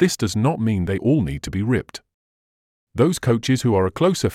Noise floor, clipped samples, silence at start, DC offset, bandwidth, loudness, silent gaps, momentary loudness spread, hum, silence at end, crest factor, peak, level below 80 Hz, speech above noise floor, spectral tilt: under -90 dBFS; under 0.1%; 0 s; under 0.1%; 15.5 kHz; -20 LUFS; 2.14-2.87 s; 7 LU; none; 0 s; 16 dB; -4 dBFS; -46 dBFS; over 71 dB; -6 dB/octave